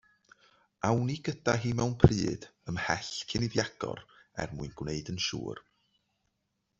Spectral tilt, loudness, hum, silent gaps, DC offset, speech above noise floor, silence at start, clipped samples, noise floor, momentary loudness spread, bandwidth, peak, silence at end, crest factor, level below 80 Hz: -5.5 dB/octave; -32 LUFS; none; none; under 0.1%; 50 dB; 0.85 s; under 0.1%; -80 dBFS; 15 LU; 7.8 kHz; -4 dBFS; 1.2 s; 28 dB; -48 dBFS